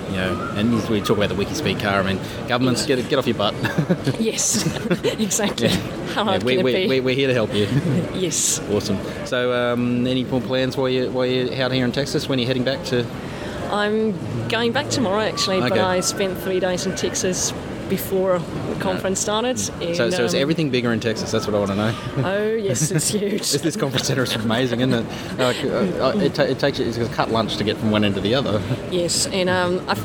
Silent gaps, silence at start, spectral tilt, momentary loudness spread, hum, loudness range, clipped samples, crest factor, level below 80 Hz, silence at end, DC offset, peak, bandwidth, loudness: none; 0 s; -4 dB/octave; 5 LU; none; 2 LU; under 0.1%; 18 dB; -46 dBFS; 0 s; under 0.1%; -2 dBFS; 19 kHz; -21 LUFS